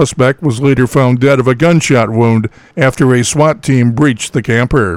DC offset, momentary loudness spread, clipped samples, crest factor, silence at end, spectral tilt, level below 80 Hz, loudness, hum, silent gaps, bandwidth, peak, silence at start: under 0.1%; 4 LU; under 0.1%; 10 dB; 0 s; -6 dB/octave; -36 dBFS; -11 LUFS; none; none; 13.5 kHz; 0 dBFS; 0 s